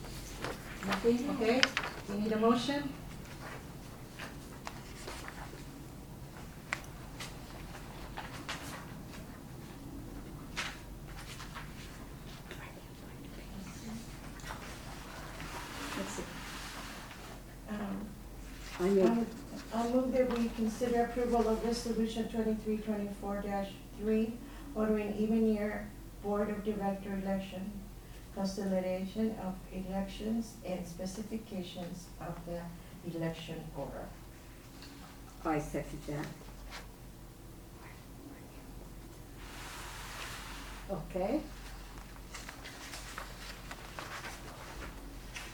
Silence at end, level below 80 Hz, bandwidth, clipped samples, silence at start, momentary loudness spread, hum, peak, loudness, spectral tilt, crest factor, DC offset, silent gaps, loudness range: 0 s; -52 dBFS; over 20 kHz; under 0.1%; 0 s; 17 LU; none; -4 dBFS; -38 LUFS; -5 dB/octave; 34 dB; under 0.1%; none; 13 LU